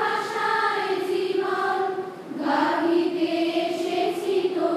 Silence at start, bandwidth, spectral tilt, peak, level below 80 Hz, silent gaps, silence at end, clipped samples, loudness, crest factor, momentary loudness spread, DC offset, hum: 0 s; 14 kHz; -4.5 dB/octave; -10 dBFS; -80 dBFS; none; 0 s; under 0.1%; -24 LUFS; 14 dB; 4 LU; under 0.1%; none